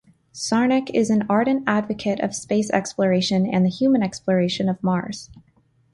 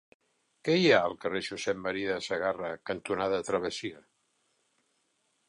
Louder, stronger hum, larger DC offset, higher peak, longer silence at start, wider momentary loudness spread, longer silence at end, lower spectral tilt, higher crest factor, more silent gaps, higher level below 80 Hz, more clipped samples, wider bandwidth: first, -21 LUFS vs -30 LUFS; neither; neither; first, -6 dBFS vs -10 dBFS; second, 0.35 s vs 0.65 s; second, 6 LU vs 13 LU; second, 0.55 s vs 1.5 s; about the same, -5.5 dB/octave vs -4.5 dB/octave; second, 16 dB vs 22 dB; neither; first, -58 dBFS vs -66 dBFS; neither; about the same, 11.5 kHz vs 11 kHz